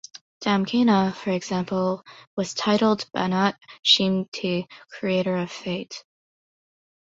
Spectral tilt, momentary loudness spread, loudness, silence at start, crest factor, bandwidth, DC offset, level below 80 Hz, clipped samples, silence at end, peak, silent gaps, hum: -5 dB/octave; 13 LU; -23 LUFS; 0.15 s; 20 dB; 8 kHz; under 0.1%; -64 dBFS; under 0.1%; 1.05 s; -4 dBFS; 0.21-0.41 s, 2.27-2.37 s, 3.79-3.83 s, 4.28-4.32 s; none